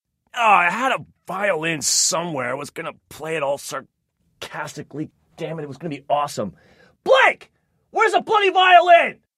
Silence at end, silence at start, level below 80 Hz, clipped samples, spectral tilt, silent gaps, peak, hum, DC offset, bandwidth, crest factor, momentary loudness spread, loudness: 0.25 s; 0.35 s; -66 dBFS; under 0.1%; -2 dB/octave; none; -2 dBFS; none; under 0.1%; 16 kHz; 20 dB; 18 LU; -18 LUFS